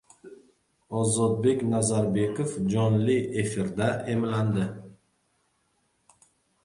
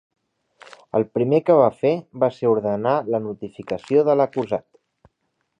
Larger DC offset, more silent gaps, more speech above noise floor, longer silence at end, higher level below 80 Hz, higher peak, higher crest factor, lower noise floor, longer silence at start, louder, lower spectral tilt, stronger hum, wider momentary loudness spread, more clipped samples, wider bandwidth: neither; neither; second, 46 dB vs 53 dB; first, 1.7 s vs 1 s; first, -58 dBFS vs -64 dBFS; second, -12 dBFS vs -4 dBFS; about the same, 16 dB vs 18 dB; about the same, -71 dBFS vs -73 dBFS; second, 0.25 s vs 0.95 s; second, -26 LUFS vs -21 LUFS; second, -6 dB/octave vs -8.5 dB/octave; neither; second, 5 LU vs 12 LU; neither; first, 11.5 kHz vs 8 kHz